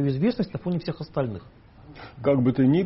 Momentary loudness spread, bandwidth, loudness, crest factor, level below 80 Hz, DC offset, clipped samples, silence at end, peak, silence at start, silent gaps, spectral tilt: 19 LU; 5.8 kHz; -25 LUFS; 16 dB; -52 dBFS; under 0.1%; under 0.1%; 0 s; -10 dBFS; 0 s; none; -8 dB/octave